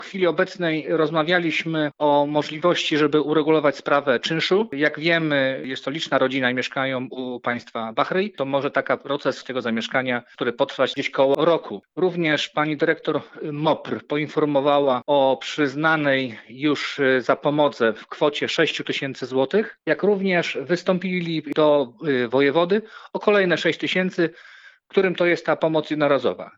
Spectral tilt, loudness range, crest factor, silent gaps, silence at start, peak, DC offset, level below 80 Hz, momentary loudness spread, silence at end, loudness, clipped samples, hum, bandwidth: -5.5 dB/octave; 3 LU; 18 dB; none; 0 s; -4 dBFS; under 0.1%; -76 dBFS; 7 LU; 0.1 s; -22 LUFS; under 0.1%; none; 8 kHz